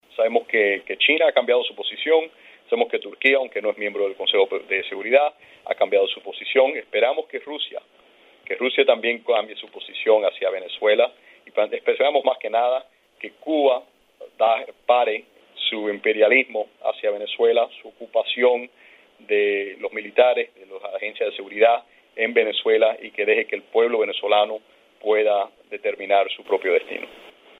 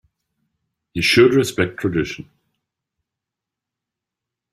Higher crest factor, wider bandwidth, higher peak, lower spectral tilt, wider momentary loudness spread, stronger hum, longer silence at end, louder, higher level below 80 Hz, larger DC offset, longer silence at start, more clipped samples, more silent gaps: about the same, 20 dB vs 20 dB; second, 4.1 kHz vs 14.5 kHz; about the same, -2 dBFS vs -2 dBFS; about the same, -4.5 dB/octave vs -5 dB/octave; second, 12 LU vs 16 LU; neither; second, 0.3 s vs 2.3 s; second, -21 LUFS vs -17 LUFS; second, -80 dBFS vs -52 dBFS; neither; second, 0.2 s vs 0.95 s; neither; neither